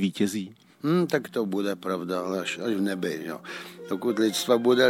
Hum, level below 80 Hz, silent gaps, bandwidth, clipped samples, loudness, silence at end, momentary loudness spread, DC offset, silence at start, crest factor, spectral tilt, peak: none; -78 dBFS; none; 17 kHz; under 0.1%; -27 LUFS; 0 s; 12 LU; under 0.1%; 0 s; 20 dB; -5 dB/octave; -8 dBFS